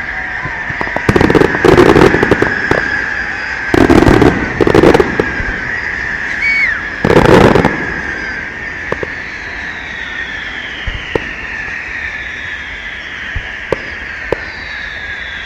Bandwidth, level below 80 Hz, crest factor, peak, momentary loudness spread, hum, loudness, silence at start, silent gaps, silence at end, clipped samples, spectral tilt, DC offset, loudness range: 16.5 kHz; -28 dBFS; 12 dB; 0 dBFS; 14 LU; none; -13 LUFS; 0 s; none; 0 s; 0.8%; -6 dB/octave; under 0.1%; 10 LU